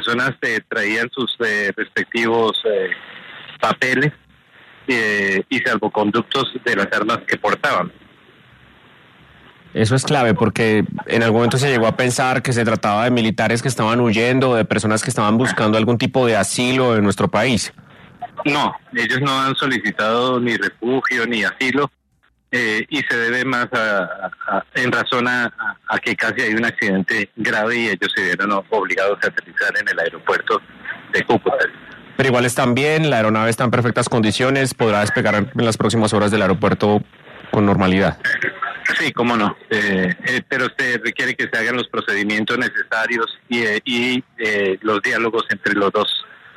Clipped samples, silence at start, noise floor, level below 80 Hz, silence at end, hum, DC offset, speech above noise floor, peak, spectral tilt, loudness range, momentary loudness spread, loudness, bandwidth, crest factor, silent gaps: under 0.1%; 0 s; -62 dBFS; -56 dBFS; 0.2 s; none; under 0.1%; 44 dB; -4 dBFS; -5 dB/octave; 3 LU; 5 LU; -18 LUFS; 13.5 kHz; 14 dB; none